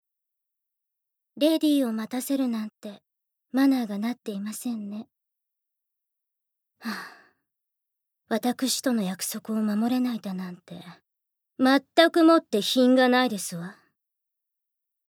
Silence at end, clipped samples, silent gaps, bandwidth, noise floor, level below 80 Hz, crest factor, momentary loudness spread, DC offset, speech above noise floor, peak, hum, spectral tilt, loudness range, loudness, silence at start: 1.35 s; under 0.1%; none; 18 kHz; -84 dBFS; -86 dBFS; 22 dB; 19 LU; under 0.1%; 60 dB; -6 dBFS; none; -4 dB/octave; 15 LU; -24 LUFS; 1.35 s